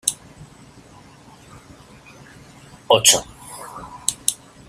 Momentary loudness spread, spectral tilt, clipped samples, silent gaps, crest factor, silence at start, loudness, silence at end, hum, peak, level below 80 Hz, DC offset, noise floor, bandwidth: 24 LU; -0.5 dB/octave; under 0.1%; none; 24 dB; 0.05 s; -17 LUFS; 0.35 s; none; 0 dBFS; -54 dBFS; under 0.1%; -46 dBFS; 16 kHz